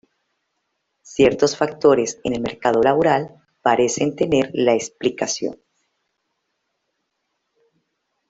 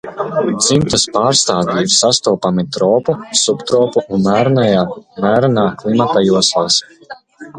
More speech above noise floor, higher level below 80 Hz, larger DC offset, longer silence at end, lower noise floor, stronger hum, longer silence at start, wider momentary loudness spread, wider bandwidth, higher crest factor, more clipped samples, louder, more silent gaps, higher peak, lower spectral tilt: first, 56 dB vs 21 dB; second, -56 dBFS vs -48 dBFS; neither; first, 2.75 s vs 0 s; first, -75 dBFS vs -34 dBFS; neither; first, 1.1 s vs 0.05 s; first, 8 LU vs 5 LU; second, 8.2 kHz vs 11 kHz; about the same, 18 dB vs 14 dB; neither; second, -19 LUFS vs -13 LUFS; neither; about the same, -2 dBFS vs 0 dBFS; about the same, -4.5 dB/octave vs -4 dB/octave